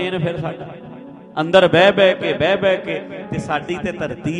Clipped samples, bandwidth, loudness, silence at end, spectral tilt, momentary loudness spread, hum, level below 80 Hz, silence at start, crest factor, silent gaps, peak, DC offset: under 0.1%; 10 kHz; -17 LUFS; 0 s; -6 dB/octave; 20 LU; none; -50 dBFS; 0 s; 18 dB; none; 0 dBFS; under 0.1%